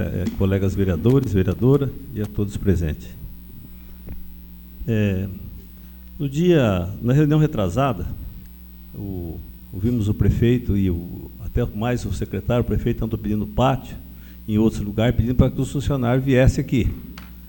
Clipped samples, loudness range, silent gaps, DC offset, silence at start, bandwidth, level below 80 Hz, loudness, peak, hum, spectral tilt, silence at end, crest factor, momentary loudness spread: under 0.1%; 6 LU; none; under 0.1%; 0 s; 18 kHz; -32 dBFS; -21 LUFS; -2 dBFS; none; -8 dB/octave; 0 s; 20 dB; 21 LU